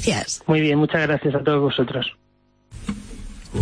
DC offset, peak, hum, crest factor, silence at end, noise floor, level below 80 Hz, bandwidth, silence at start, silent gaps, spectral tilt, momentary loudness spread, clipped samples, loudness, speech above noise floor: under 0.1%; -4 dBFS; 50 Hz at -45 dBFS; 18 dB; 0 s; -61 dBFS; -42 dBFS; 10.5 kHz; 0 s; none; -5 dB/octave; 16 LU; under 0.1%; -21 LUFS; 41 dB